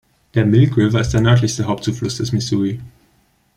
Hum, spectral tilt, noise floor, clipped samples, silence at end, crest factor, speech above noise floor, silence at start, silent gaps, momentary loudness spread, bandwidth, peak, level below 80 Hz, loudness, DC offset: none; -6.5 dB/octave; -58 dBFS; under 0.1%; 0.7 s; 16 dB; 43 dB; 0.35 s; none; 9 LU; 11 kHz; -2 dBFS; -40 dBFS; -17 LUFS; under 0.1%